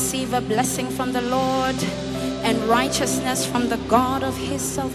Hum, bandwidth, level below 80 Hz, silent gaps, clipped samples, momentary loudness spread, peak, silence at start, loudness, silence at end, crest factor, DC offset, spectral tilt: none; 17 kHz; -44 dBFS; none; under 0.1%; 6 LU; -4 dBFS; 0 s; -22 LUFS; 0 s; 18 dB; under 0.1%; -4 dB/octave